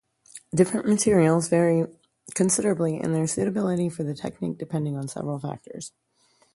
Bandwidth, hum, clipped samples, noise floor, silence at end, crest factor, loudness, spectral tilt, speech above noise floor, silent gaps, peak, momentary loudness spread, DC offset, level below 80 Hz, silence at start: 11.5 kHz; none; under 0.1%; -64 dBFS; 0.65 s; 20 dB; -24 LUFS; -6 dB/octave; 40 dB; none; -6 dBFS; 13 LU; under 0.1%; -60 dBFS; 0.35 s